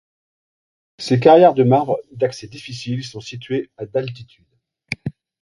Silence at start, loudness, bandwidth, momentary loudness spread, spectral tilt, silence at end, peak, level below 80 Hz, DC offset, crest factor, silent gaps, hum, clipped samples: 1 s; -17 LUFS; 11.5 kHz; 21 LU; -7 dB/octave; 0.3 s; 0 dBFS; -58 dBFS; under 0.1%; 18 dB; none; none; under 0.1%